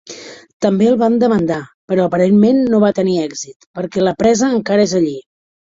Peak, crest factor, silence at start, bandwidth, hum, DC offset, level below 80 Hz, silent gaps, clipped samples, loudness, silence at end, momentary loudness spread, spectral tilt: -2 dBFS; 14 dB; 0.1 s; 7.8 kHz; none; under 0.1%; -52 dBFS; 0.53-0.60 s, 1.74-1.88 s, 3.56-3.60 s, 3.67-3.74 s; under 0.1%; -14 LUFS; 0.55 s; 15 LU; -6 dB/octave